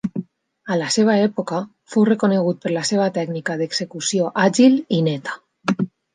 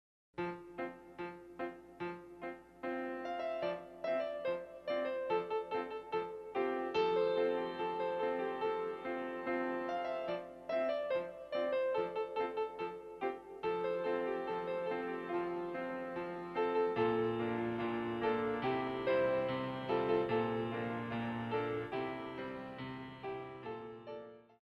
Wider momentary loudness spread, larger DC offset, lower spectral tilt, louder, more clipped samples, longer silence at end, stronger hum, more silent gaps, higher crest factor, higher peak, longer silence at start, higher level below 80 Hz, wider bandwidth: about the same, 12 LU vs 12 LU; neither; second, -5 dB/octave vs -7.5 dB/octave; first, -19 LUFS vs -38 LUFS; neither; about the same, 0.25 s vs 0.2 s; neither; neither; about the same, 16 dB vs 18 dB; first, -2 dBFS vs -20 dBFS; second, 0.05 s vs 0.35 s; first, -66 dBFS vs -72 dBFS; first, 9.8 kHz vs 7 kHz